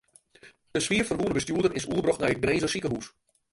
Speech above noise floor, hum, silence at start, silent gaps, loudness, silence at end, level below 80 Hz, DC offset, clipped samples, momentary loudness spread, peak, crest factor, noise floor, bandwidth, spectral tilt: 29 dB; none; 0.45 s; none; -27 LUFS; 0.45 s; -52 dBFS; under 0.1%; under 0.1%; 8 LU; -10 dBFS; 18 dB; -56 dBFS; 11.5 kHz; -4.5 dB/octave